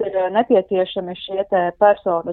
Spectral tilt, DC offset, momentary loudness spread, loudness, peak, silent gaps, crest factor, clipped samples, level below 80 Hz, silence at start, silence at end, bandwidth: -9 dB/octave; under 0.1%; 10 LU; -18 LUFS; -2 dBFS; none; 16 dB; under 0.1%; -58 dBFS; 0 s; 0 s; 4.2 kHz